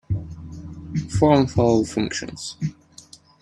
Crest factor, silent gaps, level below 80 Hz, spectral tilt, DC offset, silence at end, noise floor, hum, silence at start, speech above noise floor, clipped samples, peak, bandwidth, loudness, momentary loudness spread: 20 dB; none; -44 dBFS; -6.5 dB/octave; under 0.1%; 0.7 s; -48 dBFS; none; 0.1 s; 28 dB; under 0.1%; -2 dBFS; 11.5 kHz; -22 LUFS; 20 LU